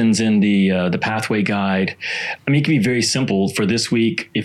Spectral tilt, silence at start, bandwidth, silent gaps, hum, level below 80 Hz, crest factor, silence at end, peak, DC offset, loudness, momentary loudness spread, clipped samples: -5 dB/octave; 0 s; 13 kHz; none; none; -60 dBFS; 14 dB; 0 s; -4 dBFS; under 0.1%; -18 LUFS; 5 LU; under 0.1%